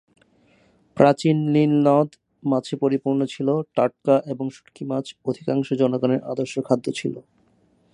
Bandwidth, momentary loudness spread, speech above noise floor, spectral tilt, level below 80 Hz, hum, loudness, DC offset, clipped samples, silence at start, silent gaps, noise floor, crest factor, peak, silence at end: 11 kHz; 12 LU; 40 dB; -7.5 dB/octave; -68 dBFS; none; -22 LUFS; under 0.1%; under 0.1%; 0.95 s; none; -61 dBFS; 22 dB; 0 dBFS; 0.75 s